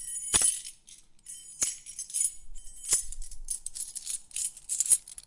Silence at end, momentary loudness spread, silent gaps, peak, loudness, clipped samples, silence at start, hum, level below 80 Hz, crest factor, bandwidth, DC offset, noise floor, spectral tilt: 0.05 s; 20 LU; none; -6 dBFS; -28 LUFS; under 0.1%; 0 s; none; -48 dBFS; 28 dB; 12 kHz; under 0.1%; -54 dBFS; 1 dB/octave